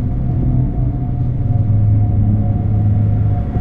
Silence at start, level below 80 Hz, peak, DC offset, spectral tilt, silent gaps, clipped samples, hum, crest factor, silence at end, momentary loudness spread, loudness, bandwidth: 0 s; -22 dBFS; -4 dBFS; under 0.1%; -12.5 dB/octave; none; under 0.1%; none; 10 dB; 0 s; 5 LU; -16 LUFS; 2.4 kHz